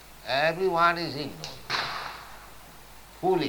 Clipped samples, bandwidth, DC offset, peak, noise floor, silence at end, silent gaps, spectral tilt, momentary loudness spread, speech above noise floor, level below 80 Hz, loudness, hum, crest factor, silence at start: under 0.1%; 19.5 kHz; under 0.1%; -8 dBFS; -48 dBFS; 0 s; none; -4.5 dB/octave; 25 LU; 23 dB; -56 dBFS; -27 LUFS; none; 22 dB; 0 s